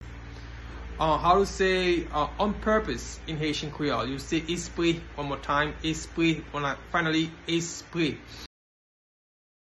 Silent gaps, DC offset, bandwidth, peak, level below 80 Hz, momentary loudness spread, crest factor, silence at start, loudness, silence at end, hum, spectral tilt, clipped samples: none; under 0.1%; 12 kHz; -8 dBFS; -44 dBFS; 18 LU; 20 dB; 0 s; -28 LUFS; 1.3 s; none; -4.5 dB/octave; under 0.1%